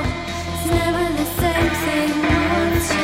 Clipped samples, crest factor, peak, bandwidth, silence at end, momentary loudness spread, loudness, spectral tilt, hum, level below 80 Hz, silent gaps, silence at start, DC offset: under 0.1%; 14 dB; -6 dBFS; 16.5 kHz; 0 s; 6 LU; -19 LUFS; -5 dB/octave; none; -30 dBFS; none; 0 s; under 0.1%